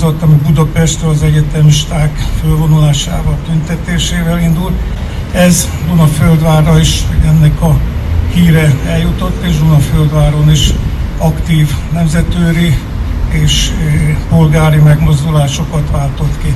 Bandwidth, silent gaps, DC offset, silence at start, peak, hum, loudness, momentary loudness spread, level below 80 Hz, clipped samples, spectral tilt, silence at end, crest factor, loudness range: 13.5 kHz; none; under 0.1%; 0 s; 0 dBFS; none; -10 LUFS; 7 LU; -16 dBFS; 0.5%; -6 dB/octave; 0 s; 8 dB; 3 LU